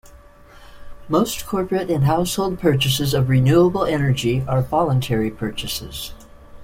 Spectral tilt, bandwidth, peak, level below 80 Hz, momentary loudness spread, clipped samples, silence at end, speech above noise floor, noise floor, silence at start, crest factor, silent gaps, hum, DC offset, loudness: -6 dB/octave; 16.5 kHz; -4 dBFS; -40 dBFS; 11 LU; under 0.1%; 0 s; 26 dB; -45 dBFS; 0.05 s; 16 dB; none; none; under 0.1%; -19 LUFS